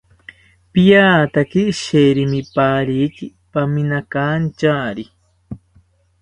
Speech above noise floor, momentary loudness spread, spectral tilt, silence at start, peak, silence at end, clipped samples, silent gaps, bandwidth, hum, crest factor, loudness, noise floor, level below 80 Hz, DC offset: 39 dB; 20 LU; -6.5 dB/octave; 0.75 s; 0 dBFS; 0.65 s; under 0.1%; none; 10.5 kHz; none; 16 dB; -16 LUFS; -54 dBFS; -48 dBFS; under 0.1%